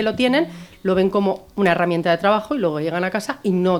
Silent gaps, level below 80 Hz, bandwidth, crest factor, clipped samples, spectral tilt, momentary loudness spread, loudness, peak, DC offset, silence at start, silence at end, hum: none; -54 dBFS; 17.5 kHz; 18 dB; under 0.1%; -6.5 dB/octave; 6 LU; -20 LUFS; -2 dBFS; under 0.1%; 0 s; 0 s; none